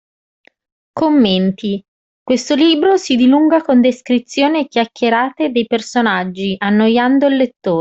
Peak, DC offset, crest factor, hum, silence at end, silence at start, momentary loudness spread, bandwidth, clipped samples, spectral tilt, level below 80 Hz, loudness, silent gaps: -2 dBFS; under 0.1%; 12 dB; none; 0 s; 0.95 s; 7 LU; 8 kHz; under 0.1%; -5.5 dB/octave; -56 dBFS; -14 LUFS; 1.88-2.26 s